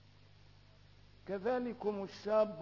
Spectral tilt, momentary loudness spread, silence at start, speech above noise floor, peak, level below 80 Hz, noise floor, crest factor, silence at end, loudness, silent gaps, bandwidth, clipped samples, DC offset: -5 dB/octave; 10 LU; 1.25 s; 26 dB; -20 dBFS; -70 dBFS; -62 dBFS; 20 dB; 0 s; -37 LUFS; none; 6 kHz; under 0.1%; under 0.1%